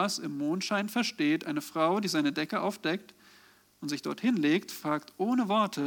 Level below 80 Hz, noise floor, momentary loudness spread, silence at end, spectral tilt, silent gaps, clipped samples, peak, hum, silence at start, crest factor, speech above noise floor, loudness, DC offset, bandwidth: -82 dBFS; -60 dBFS; 7 LU; 0 s; -4.5 dB/octave; none; under 0.1%; -14 dBFS; none; 0 s; 16 dB; 31 dB; -30 LUFS; under 0.1%; 19 kHz